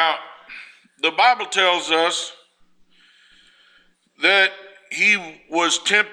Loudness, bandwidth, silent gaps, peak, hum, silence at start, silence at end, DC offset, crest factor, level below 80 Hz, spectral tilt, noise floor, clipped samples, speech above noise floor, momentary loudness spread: -18 LUFS; 13.5 kHz; none; -2 dBFS; none; 0 s; 0 s; under 0.1%; 20 dB; -72 dBFS; -0.5 dB/octave; -58 dBFS; under 0.1%; 39 dB; 17 LU